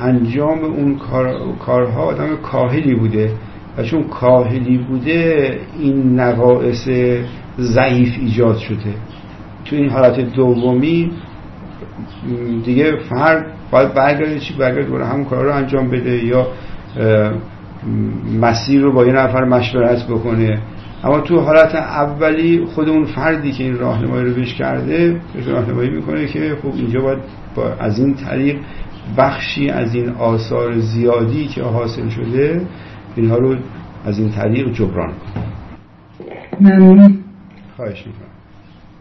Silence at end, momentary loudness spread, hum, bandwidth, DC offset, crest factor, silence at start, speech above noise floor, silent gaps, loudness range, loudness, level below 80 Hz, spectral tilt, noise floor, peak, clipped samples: 0.4 s; 15 LU; none; 6.2 kHz; under 0.1%; 14 dB; 0 s; 26 dB; none; 5 LU; -15 LUFS; -40 dBFS; -8.5 dB/octave; -41 dBFS; 0 dBFS; under 0.1%